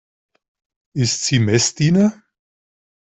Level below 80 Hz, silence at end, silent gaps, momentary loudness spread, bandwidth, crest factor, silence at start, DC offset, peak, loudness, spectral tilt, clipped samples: -54 dBFS; 0.9 s; none; 6 LU; 8.4 kHz; 16 dB; 0.95 s; under 0.1%; -4 dBFS; -17 LUFS; -4.5 dB/octave; under 0.1%